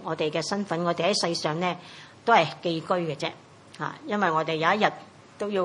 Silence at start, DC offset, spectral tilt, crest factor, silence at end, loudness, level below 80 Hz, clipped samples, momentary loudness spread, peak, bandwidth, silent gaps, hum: 0 s; under 0.1%; -4.5 dB/octave; 22 dB; 0 s; -26 LUFS; -76 dBFS; under 0.1%; 13 LU; -4 dBFS; 11.5 kHz; none; none